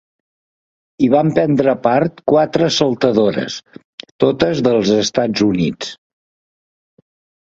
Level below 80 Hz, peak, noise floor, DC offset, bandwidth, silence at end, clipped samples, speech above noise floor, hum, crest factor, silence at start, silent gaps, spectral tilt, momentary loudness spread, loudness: -50 dBFS; 0 dBFS; under -90 dBFS; under 0.1%; 8 kHz; 1.55 s; under 0.1%; over 75 dB; none; 16 dB; 1 s; 3.84-3.98 s, 4.11-4.19 s; -5.5 dB/octave; 12 LU; -15 LUFS